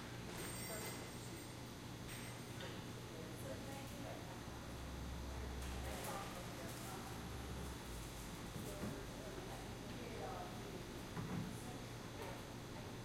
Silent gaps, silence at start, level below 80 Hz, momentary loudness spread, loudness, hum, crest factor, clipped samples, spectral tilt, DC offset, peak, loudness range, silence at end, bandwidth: none; 0 s; -58 dBFS; 4 LU; -49 LUFS; none; 16 dB; under 0.1%; -4.5 dB/octave; under 0.1%; -34 dBFS; 2 LU; 0 s; 16.5 kHz